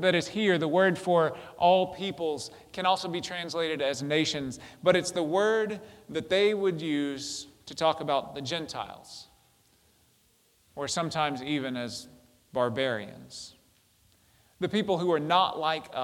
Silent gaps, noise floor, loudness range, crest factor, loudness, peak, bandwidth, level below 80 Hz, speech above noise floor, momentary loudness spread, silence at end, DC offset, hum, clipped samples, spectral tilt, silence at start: none; -66 dBFS; 7 LU; 22 dB; -28 LUFS; -8 dBFS; 16 kHz; -68 dBFS; 38 dB; 15 LU; 0 s; under 0.1%; none; under 0.1%; -4.5 dB/octave; 0 s